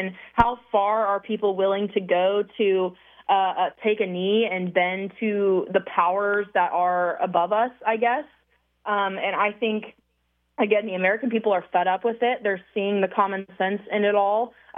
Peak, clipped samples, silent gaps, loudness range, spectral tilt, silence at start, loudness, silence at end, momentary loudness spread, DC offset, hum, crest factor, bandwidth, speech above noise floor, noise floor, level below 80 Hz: -4 dBFS; under 0.1%; none; 2 LU; -8 dB/octave; 0 s; -23 LUFS; 0 s; 5 LU; under 0.1%; none; 20 dB; 3.8 kHz; 48 dB; -71 dBFS; -54 dBFS